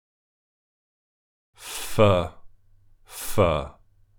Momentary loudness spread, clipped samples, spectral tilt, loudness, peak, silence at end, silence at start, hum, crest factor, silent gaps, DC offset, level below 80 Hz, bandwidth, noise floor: 21 LU; under 0.1%; -5.5 dB/octave; -24 LUFS; -6 dBFS; 0.45 s; 1.6 s; none; 22 dB; none; under 0.1%; -46 dBFS; over 20 kHz; -55 dBFS